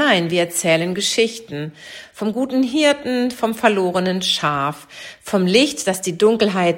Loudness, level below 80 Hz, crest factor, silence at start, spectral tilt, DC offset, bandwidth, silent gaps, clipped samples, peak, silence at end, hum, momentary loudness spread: -18 LUFS; -60 dBFS; 18 dB; 0 s; -4 dB/octave; under 0.1%; 16.5 kHz; none; under 0.1%; -2 dBFS; 0 s; none; 14 LU